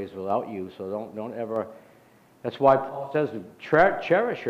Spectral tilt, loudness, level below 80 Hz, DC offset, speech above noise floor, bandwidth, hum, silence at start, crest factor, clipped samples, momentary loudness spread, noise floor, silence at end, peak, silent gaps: -7.5 dB/octave; -25 LUFS; -58 dBFS; under 0.1%; 31 dB; 8.8 kHz; none; 0 s; 20 dB; under 0.1%; 15 LU; -56 dBFS; 0 s; -6 dBFS; none